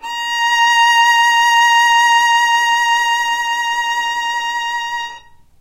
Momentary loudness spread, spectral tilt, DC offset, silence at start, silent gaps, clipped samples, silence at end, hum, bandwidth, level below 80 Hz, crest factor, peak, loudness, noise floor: 9 LU; 3.5 dB/octave; under 0.1%; 0.05 s; none; under 0.1%; 0.4 s; none; 16 kHz; -56 dBFS; 12 dB; -2 dBFS; -13 LUFS; -38 dBFS